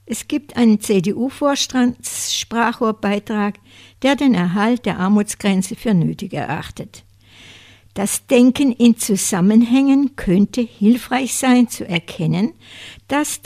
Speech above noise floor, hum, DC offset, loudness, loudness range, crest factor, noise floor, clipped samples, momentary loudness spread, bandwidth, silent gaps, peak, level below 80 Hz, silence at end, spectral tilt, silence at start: 28 dB; none; under 0.1%; -17 LUFS; 5 LU; 16 dB; -45 dBFS; under 0.1%; 10 LU; 15.5 kHz; none; 0 dBFS; -48 dBFS; 0.1 s; -5 dB/octave; 0.1 s